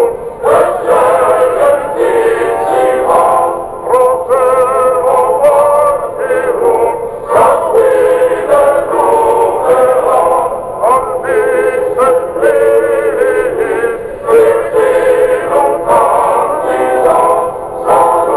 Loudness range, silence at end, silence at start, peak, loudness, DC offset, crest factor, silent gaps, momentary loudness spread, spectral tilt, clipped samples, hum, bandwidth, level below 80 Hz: 1 LU; 0 s; 0 s; 0 dBFS; -10 LUFS; under 0.1%; 8 dB; none; 5 LU; -4.5 dB/octave; under 0.1%; none; 11 kHz; -42 dBFS